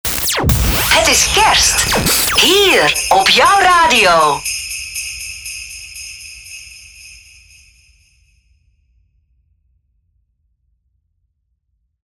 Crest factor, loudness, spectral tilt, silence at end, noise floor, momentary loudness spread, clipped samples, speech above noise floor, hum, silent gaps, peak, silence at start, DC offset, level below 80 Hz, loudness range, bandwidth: 16 dB; -11 LUFS; -1.5 dB/octave; 4.95 s; -67 dBFS; 20 LU; under 0.1%; 56 dB; none; none; 0 dBFS; 0.05 s; under 0.1%; -30 dBFS; 21 LU; over 20 kHz